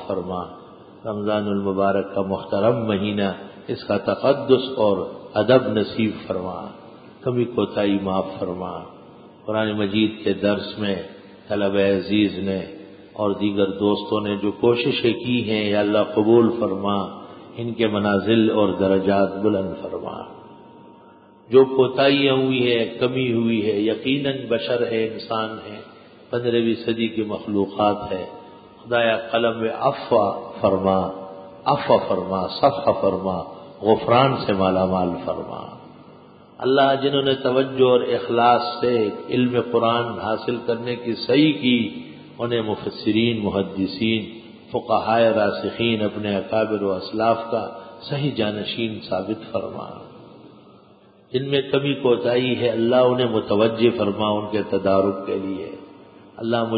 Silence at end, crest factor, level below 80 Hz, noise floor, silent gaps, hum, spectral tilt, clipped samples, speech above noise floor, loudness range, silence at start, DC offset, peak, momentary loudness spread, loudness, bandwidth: 0 s; 20 dB; -54 dBFS; -51 dBFS; none; none; -11 dB/octave; under 0.1%; 31 dB; 5 LU; 0 s; under 0.1%; -2 dBFS; 13 LU; -21 LUFS; 5 kHz